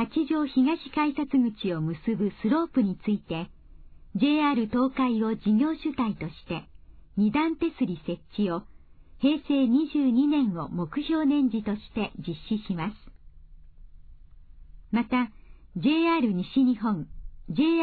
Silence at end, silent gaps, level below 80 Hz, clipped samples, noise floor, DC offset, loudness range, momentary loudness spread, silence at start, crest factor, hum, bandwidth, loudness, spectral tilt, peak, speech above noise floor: 0 s; none; -52 dBFS; under 0.1%; -49 dBFS; under 0.1%; 7 LU; 12 LU; 0 s; 14 dB; none; 4.7 kHz; -27 LUFS; -10 dB/octave; -12 dBFS; 24 dB